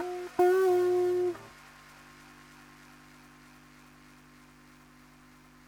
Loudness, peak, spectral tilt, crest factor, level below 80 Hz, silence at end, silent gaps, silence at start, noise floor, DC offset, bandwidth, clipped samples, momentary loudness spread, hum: -27 LUFS; -14 dBFS; -5.5 dB/octave; 18 dB; -68 dBFS; 4.2 s; none; 0 s; -56 dBFS; under 0.1%; 19 kHz; under 0.1%; 28 LU; 50 Hz at -65 dBFS